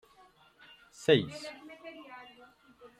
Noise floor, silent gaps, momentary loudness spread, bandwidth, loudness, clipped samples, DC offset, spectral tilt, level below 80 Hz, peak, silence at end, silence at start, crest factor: -62 dBFS; none; 25 LU; 14 kHz; -30 LUFS; under 0.1%; under 0.1%; -5.5 dB/octave; -74 dBFS; -10 dBFS; 0.8 s; 1 s; 24 dB